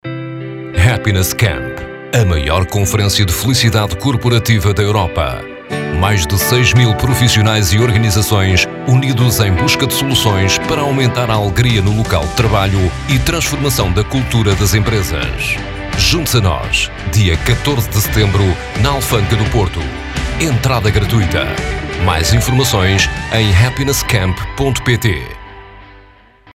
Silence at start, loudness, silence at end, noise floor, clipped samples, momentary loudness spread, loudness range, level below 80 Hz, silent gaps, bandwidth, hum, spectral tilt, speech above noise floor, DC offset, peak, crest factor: 0.05 s; -13 LUFS; 0.55 s; -43 dBFS; under 0.1%; 7 LU; 3 LU; -26 dBFS; none; 16.5 kHz; none; -4.5 dB/octave; 31 dB; under 0.1%; 0 dBFS; 12 dB